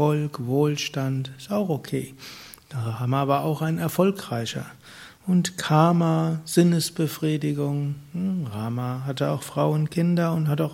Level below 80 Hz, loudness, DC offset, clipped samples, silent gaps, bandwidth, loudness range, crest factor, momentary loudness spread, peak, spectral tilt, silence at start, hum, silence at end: -64 dBFS; -24 LUFS; under 0.1%; under 0.1%; none; 16.5 kHz; 4 LU; 20 dB; 12 LU; -4 dBFS; -6.5 dB/octave; 0 s; none; 0 s